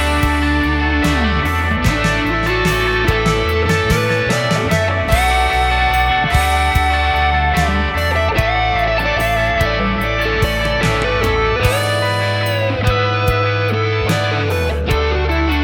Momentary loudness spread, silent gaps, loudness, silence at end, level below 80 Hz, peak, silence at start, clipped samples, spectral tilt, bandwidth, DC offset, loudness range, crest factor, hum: 3 LU; none; -15 LUFS; 0 s; -22 dBFS; 0 dBFS; 0 s; under 0.1%; -5 dB/octave; 19 kHz; under 0.1%; 2 LU; 16 dB; none